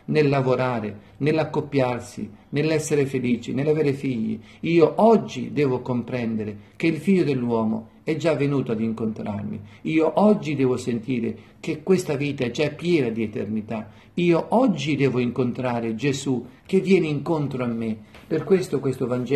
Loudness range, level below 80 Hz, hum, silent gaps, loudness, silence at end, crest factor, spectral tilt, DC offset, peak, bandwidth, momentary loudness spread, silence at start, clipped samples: 3 LU; -58 dBFS; none; none; -23 LUFS; 0 s; 18 dB; -7 dB/octave; under 0.1%; -4 dBFS; 13 kHz; 11 LU; 0.1 s; under 0.1%